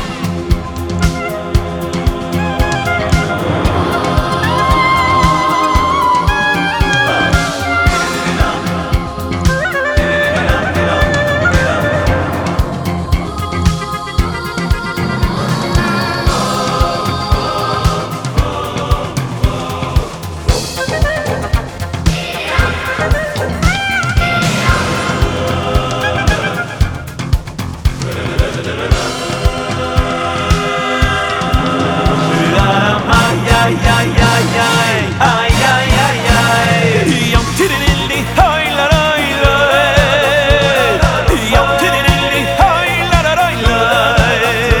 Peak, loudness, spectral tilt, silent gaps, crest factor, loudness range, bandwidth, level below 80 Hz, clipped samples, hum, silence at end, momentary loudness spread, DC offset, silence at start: 0 dBFS; -13 LUFS; -5 dB/octave; none; 12 dB; 6 LU; over 20 kHz; -20 dBFS; under 0.1%; none; 0 s; 7 LU; under 0.1%; 0 s